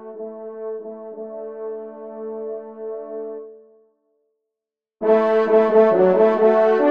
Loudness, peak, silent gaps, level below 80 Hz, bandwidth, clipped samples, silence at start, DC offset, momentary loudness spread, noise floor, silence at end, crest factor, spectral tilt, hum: -16 LUFS; -4 dBFS; none; -70 dBFS; 5.2 kHz; under 0.1%; 0 s; under 0.1%; 19 LU; -86 dBFS; 0 s; 16 dB; -8.5 dB/octave; none